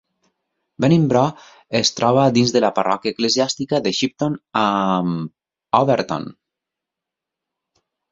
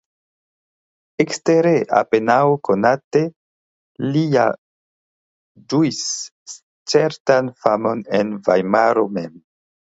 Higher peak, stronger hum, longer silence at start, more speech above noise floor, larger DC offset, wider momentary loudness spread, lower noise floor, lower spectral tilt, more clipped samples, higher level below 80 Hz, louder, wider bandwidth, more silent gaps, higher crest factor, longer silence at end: about the same, 0 dBFS vs 0 dBFS; neither; second, 0.8 s vs 1.2 s; second, 67 dB vs over 73 dB; neither; second, 9 LU vs 13 LU; second, -85 dBFS vs under -90 dBFS; about the same, -5 dB/octave vs -5 dB/octave; neither; first, -58 dBFS vs -64 dBFS; about the same, -18 LUFS vs -18 LUFS; about the same, 7.8 kHz vs 8 kHz; second, none vs 3.04-3.11 s, 3.36-3.95 s, 4.58-5.55 s, 6.31-6.46 s, 6.63-6.85 s, 7.20-7.25 s; about the same, 20 dB vs 18 dB; first, 1.8 s vs 0.55 s